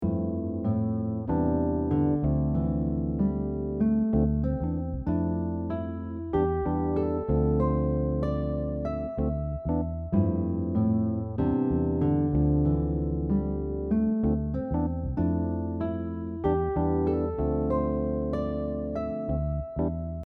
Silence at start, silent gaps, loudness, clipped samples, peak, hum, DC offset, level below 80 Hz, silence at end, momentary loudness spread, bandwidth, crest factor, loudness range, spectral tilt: 0 s; none; -28 LUFS; under 0.1%; -10 dBFS; none; under 0.1%; -36 dBFS; 0 s; 6 LU; 4.3 kHz; 16 dB; 2 LU; -12.5 dB/octave